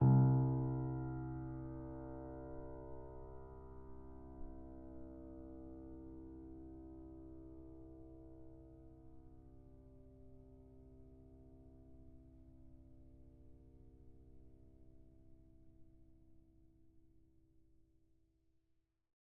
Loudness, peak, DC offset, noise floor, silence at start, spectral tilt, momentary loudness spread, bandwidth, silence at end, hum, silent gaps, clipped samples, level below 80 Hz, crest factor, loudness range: -43 LUFS; -22 dBFS; under 0.1%; -80 dBFS; 0 s; -11.5 dB/octave; 22 LU; 1.8 kHz; 1.4 s; none; none; under 0.1%; -60 dBFS; 22 dB; 18 LU